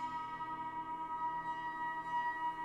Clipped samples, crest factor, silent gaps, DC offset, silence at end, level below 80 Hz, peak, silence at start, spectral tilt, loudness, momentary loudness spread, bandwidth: under 0.1%; 12 dB; none; under 0.1%; 0 s; -70 dBFS; -30 dBFS; 0 s; -4.5 dB/octave; -40 LUFS; 4 LU; 10.5 kHz